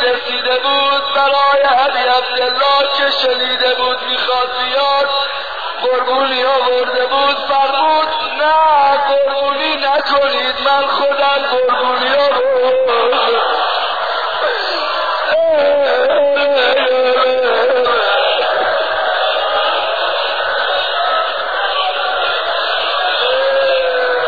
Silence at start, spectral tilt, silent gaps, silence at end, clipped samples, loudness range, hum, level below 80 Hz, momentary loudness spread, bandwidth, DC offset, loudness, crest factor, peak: 0 s; -3 dB/octave; none; 0 s; under 0.1%; 2 LU; none; -54 dBFS; 4 LU; 4.9 kHz; 2%; -13 LUFS; 10 dB; -2 dBFS